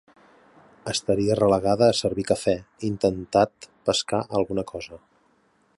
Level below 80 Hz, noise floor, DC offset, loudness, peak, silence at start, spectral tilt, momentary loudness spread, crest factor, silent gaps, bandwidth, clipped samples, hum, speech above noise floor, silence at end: -52 dBFS; -64 dBFS; under 0.1%; -24 LUFS; -6 dBFS; 0.85 s; -5 dB/octave; 11 LU; 18 dB; none; 11.5 kHz; under 0.1%; none; 41 dB; 0.8 s